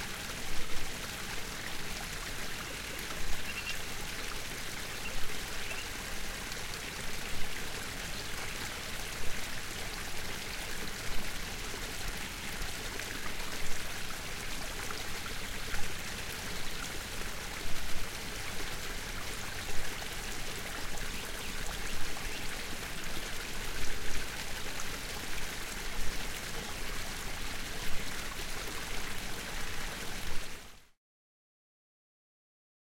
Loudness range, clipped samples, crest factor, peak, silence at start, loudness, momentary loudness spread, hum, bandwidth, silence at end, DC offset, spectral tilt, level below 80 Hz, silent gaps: 1 LU; under 0.1%; 16 dB; -16 dBFS; 0 s; -39 LUFS; 1 LU; none; 16.5 kHz; 2.15 s; under 0.1%; -2 dB/octave; -44 dBFS; none